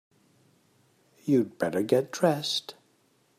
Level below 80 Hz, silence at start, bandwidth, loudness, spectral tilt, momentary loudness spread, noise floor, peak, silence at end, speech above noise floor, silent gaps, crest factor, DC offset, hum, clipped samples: -76 dBFS; 1.25 s; 15.5 kHz; -27 LUFS; -5 dB/octave; 9 LU; -67 dBFS; -10 dBFS; 0.65 s; 41 dB; none; 20 dB; under 0.1%; none; under 0.1%